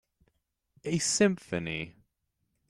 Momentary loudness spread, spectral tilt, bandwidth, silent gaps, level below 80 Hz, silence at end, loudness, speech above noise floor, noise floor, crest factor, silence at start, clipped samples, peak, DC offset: 16 LU; -4 dB/octave; 13 kHz; none; -64 dBFS; 0.8 s; -29 LUFS; 50 dB; -80 dBFS; 22 dB; 0.85 s; under 0.1%; -12 dBFS; under 0.1%